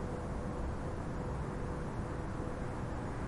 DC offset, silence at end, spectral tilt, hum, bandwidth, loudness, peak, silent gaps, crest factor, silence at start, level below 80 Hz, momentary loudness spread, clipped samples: under 0.1%; 0 s; -7.5 dB/octave; none; 11.5 kHz; -40 LUFS; -26 dBFS; none; 12 dB; 0 s; -44 dBFS; 1 LU; under 0.1%